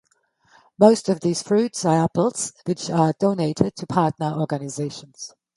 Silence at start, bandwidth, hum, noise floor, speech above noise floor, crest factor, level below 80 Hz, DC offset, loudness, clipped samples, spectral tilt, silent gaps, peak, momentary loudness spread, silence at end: 0.8 s; 11.5 kHz; none; -63 dBFS; 42 dB; 22 dB; -58 dBFS; under 0.1%; -21 LUFS; under 0.1%; -6 dB/octave; none; 0 dBFS; 13 LU; 0.3 s